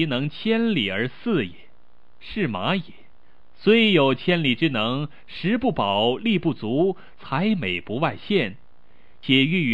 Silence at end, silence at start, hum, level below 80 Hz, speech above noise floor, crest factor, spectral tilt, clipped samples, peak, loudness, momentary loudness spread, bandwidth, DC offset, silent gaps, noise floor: 0 s; 0 s; none; -56 dBFS; 38 dB; 18 dB; -7.5 dB/octave; under 0.1%; -6 dBFS; -22 LUFS; 11 LU; 9.4 kHz; 1%; none; -60 dBFS